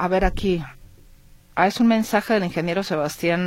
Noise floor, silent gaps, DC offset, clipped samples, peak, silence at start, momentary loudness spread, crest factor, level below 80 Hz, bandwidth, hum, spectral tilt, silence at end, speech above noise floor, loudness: -49 dBFS; none; under 0.1%; under 0.1%; -4 dBFS; 0 s; 8 LU; 18 dB; -36 dBFS; 16.5 kHz; none; -5.5 dB/octave; 0 s; 28 dB; -22 LUFS